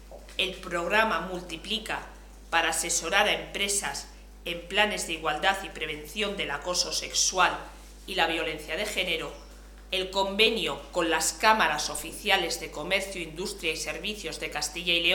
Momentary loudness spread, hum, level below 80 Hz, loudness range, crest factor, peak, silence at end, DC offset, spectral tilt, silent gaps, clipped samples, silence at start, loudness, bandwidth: 12 LU; 50 Hz at -50 dBFS; -48 dBFS; 3 LU; 24 dB; -4 dBFS; 0 s; under 0.1%; -1.5 dB/octave; none; under 0.1%; 0 s; -27 LUFS; 19.5 kHz